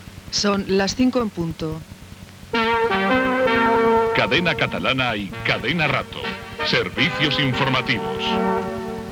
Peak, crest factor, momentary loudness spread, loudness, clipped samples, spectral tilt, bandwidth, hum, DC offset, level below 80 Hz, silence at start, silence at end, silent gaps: -4 dBFS; 16 dB; 11 LU; -20 LUFS; under 0.1%; -4.5 dB/octave; 20 kHz; none; under 0.1%; -46 dBFS; 0 s; 0 s; none